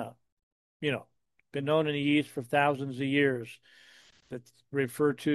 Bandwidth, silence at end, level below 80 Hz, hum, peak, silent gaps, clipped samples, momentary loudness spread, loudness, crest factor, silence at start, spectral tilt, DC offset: 12.5 kHz; 0 s; -76 dBFS; none; -12 dBFS; 0.32-0.37 s, 0.43-0.80 s; under 0.1%; 18 LU; -30 LUFS; 20 dB; 0 s; -6 dB/octave; under 0.1%